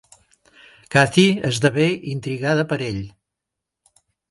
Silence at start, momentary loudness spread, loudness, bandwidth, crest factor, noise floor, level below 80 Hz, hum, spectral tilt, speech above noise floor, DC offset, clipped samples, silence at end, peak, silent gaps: 0.9 s; 12 LU; -19 LUFS; 11.5 kHz; 22 dB; -83 dBFS; -54 dBFS; none; -5.5 dB/octave; 65 dB; under 0.1%; under 0.1%; 1.2 s; 0 dBFS; none